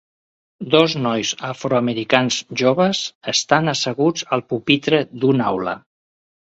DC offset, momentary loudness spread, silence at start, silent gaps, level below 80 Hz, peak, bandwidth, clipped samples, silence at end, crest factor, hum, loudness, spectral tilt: under 0.1%; 7 LU; 0.6 s; 3.15-3.21 s; -60 dBFS; 0 dBFS; 8.2 kHz; under 0.1%; 0.7 s; 20 dB; none; -19 LUFS; -4 dB/octave